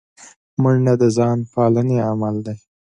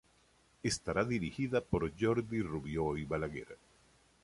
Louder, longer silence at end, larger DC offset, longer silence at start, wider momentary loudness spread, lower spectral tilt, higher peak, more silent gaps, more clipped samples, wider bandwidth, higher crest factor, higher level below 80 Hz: first, -18 LUFS vs -36 LUFS; second, 0.4 s vs 0.7 s; neither; second, 0.2 s vs 0.65 s; first, 13 LU vs 8 LU; first, -8.5 dB/octave vs -5.5 dB/octave; first, -4 dBFS vs -18 dBFS; first, 0.36-0.57 s vs none; neither; second, 10 kHz vs 11.5 kHz; about the same, 14 dB vs 18 dB; about the same, -56 dBFS vs -54 dBFS